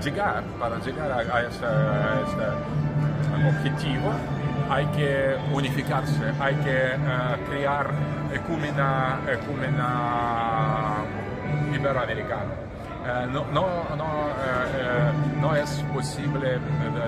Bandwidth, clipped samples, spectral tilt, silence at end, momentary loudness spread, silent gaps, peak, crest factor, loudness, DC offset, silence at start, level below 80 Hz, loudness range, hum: 12 kHz; under 0.1%; -7 dB/octave; 0 s; 5 LU; none; -8 dBFS; 16 dB; -26 LUFS; under 0.1%; 0 s; -44 dBFS; 2 LU; none